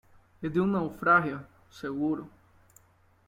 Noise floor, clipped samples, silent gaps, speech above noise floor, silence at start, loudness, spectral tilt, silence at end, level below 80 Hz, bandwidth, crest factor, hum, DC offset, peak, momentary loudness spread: -63 dBFS; under 0.1%; none; 35 dB; 0.4 s; -28 LUFS; -8 dB/octave; 1 s; -64 dBFS; 16 kHz; 20 dB; none; under 0.1%; -10 dBFS; 15 LU